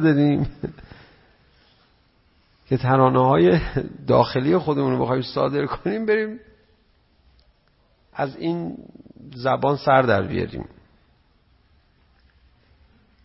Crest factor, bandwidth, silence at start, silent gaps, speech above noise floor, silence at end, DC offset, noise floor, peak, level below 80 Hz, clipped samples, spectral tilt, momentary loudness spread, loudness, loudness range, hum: 20 dB; 5.8 kHz; 0 s; none; 41 dB; 2.6 s; under 0.1%; -61 dBFS; -2 dBFS; -46 dBFS; under 0.1%; -11.5 dB/octave; 18 LU; -21 LUFS; 9 LU; none